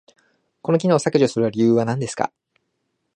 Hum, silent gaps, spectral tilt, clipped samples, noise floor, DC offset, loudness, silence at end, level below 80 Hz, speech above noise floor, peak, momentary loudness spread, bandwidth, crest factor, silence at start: none; none; -6.5 dB/octave; under 0.1%; -74 dBFS; under 0.1%; -20 LUFS; 0.9 s; -64 dBFS; 55 dB; -2 dBFS; 9 LU; 10 kHz; 18 dB; 0.65 s